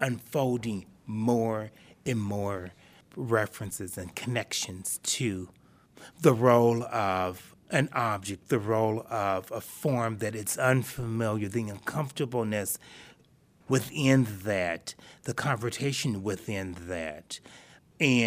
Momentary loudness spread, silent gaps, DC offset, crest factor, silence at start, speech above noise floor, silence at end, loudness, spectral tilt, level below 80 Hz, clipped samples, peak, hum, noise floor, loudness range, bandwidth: 13 LU; none; under 0.1%; 24 dB; 0 s; 33 dB; 0 s; -29 LUFS; -5 dB/octave; -62 dBFS; under 0.1%; -6 dBFS; none; -62 dBFS; 5 LU; 15.5 kHz